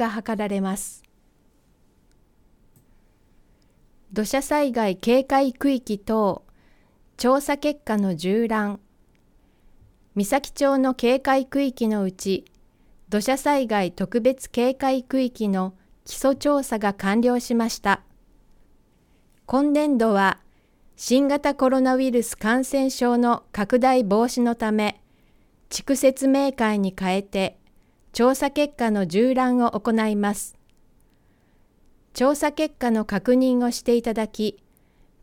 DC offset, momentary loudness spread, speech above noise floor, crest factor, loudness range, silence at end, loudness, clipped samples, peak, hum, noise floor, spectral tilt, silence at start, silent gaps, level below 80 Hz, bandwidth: under 0.1%; 8 LU; 39 dB; 18 dB; 4 LU; 0.7 s; -22 LUFS; under 0.1%; -6 dBFS; none; -60 dBFS; -5 dB/octave; 0 s; none; -52 dBFS; 17.5 kHz